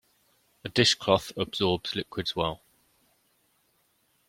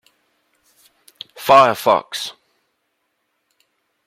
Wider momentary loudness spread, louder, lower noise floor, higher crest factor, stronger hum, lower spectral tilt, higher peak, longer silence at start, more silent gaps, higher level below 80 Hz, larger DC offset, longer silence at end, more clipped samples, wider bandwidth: second, 10 LU vs 24 LU; second, -27 LUFS vs -15 LUFS; about the same, -70 dBFS vs -71 dBFS; first, 26 dB vs 20 dB; neither; about the same, -4 dB/octave vs -3.5 dB/octave; second, -6 dBFS vs -2 dBFS; second, 0.65 s vs 1.4 s; neither; first, -58 dBFS vs -64 dBFS; neither; about the same, 1.7 s vs 1.75 s; neither; about the same, 16.5 kHz vs 16 kHz